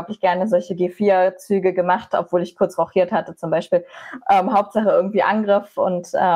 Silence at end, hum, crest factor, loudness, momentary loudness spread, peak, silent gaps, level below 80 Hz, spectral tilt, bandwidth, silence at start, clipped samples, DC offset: 0 s; none; 12 dB; -19 LUFS; 6 LU; -6 dBFS; none; -64 dBFS; -6.5 dB/octave; 12.5 kHz; 0 s; under 0.1%; under 0.1%